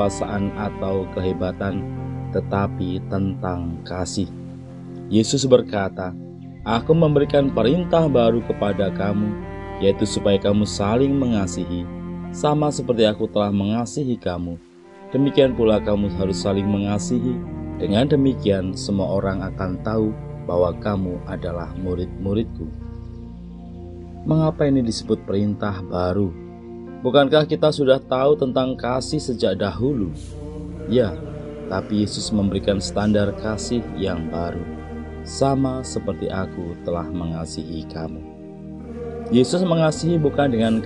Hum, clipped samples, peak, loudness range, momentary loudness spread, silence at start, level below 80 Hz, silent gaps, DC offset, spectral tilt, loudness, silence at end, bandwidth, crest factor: none; under 0.1%; 0 dBFS; 6 LU; 15 LU; 0 s; -40 dBFS; none; 0.1%; -6.5 dB/octave; -21 LUFS; 0 s; 11 kHz; 20 dB